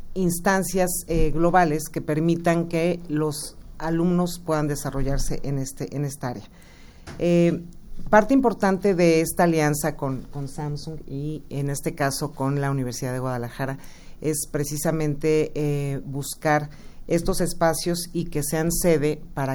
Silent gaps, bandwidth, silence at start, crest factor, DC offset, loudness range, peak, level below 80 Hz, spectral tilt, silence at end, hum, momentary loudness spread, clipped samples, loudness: none; over 20 kHz; 0 s; 20 dB; under 0.1%; 6 LU; -4 dBFS; -36 dBFS; -5.5 dB/octave; 0 s; none; 12 LU; under 0.1%; -24 LUFS